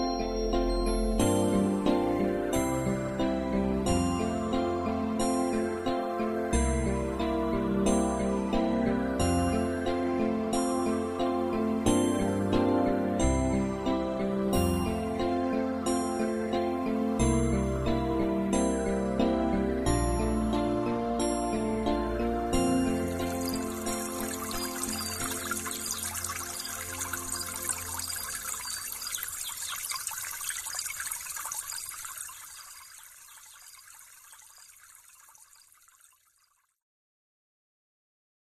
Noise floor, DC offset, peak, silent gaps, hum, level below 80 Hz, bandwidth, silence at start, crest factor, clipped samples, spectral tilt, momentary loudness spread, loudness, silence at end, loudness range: -71 dBFS; under 0.1%; -12 dBFS; none; none; -40 dBFS; 15.5 kHz; 0 s; 18 dB; under 0.1%; -5 dB/octave; 7 LU; -29 LUFS; 3.6 s; 6 LU